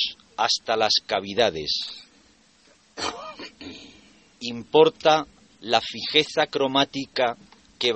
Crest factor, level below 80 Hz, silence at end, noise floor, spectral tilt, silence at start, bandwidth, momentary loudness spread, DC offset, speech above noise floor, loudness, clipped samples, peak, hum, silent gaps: 22 dB; -62 dBFS; 0 s; -58 dBFS; -3 dB/octave; 0 s; 8.4 kHz; 21 LU; under 0.1%; 35 dB; -23 LUFS; under 0.1%; -2 dBFS; none; none